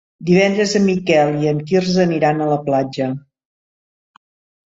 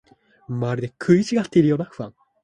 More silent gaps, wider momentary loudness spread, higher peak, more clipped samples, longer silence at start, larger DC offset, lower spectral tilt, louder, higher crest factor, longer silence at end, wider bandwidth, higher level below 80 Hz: neither; second, 7 LU vs 15 LU; about the same, -2 dBFS vs -4 dBFS; neither; second, 0.2 s vs 0.5 s; neither; second, -6 dB/octave vs -7.5 dB/octave; first, -16 LUFS vs -21 LUFS; about the same, 16 dB vs 18 dB; first, 1.5 s vs 0.35 s; second, 7.8 kHz vs 10 kHz; about the same, -56 dBFS vs -58 dBFS